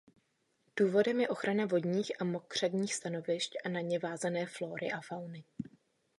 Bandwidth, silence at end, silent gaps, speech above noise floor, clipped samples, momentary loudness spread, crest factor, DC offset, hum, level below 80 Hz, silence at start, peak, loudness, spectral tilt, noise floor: 11.5 kHz; 0.55 s; none; 42 dB; under 0.1%; 14 LU; 18 dB; under 0.1%; none; -78 dBFS; 0.75 s; -16 dBFS; -34 LUFS; -5 dB/octave; -76 dBFS